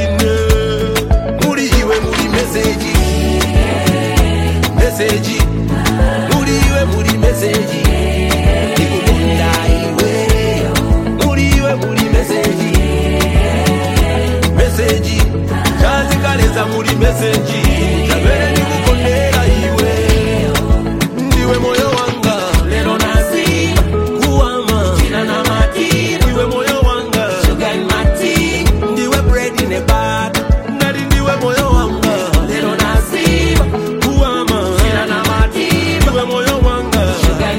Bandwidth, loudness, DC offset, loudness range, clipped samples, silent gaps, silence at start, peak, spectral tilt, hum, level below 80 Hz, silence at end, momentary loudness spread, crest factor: 16.5 kHz; -13 LUFS; under 0.1%; 1 LU; under 0.1%; none; 0 s; 0 dBFS; -5 dB/octave; none; -18 dBFS; 0 s; 2 LU; 12 dB